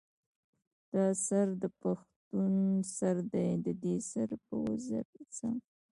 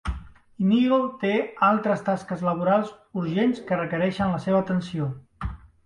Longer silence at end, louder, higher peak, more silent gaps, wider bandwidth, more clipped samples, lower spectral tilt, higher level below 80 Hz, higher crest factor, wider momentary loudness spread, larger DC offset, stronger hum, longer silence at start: about the same, 0.35 s vs 0.3 s; second, -34 LUFS vs -24 LUFS; second, -18 dBFS vs -8 dBFS; first, 2.16-2.31 s, 5.05-5.13 s vs none; about the same, 11.5 kHz vs 10.5 kHz; neither; about the same, -7 dB/octave vs -8 dB/octave; second, -72 dBFS vs -44 dBFS; about the same, 16 dB vs 16 dB; second, 9 LU vs 13 LU; neither; neither; first, 0.95 s vs 0.05 s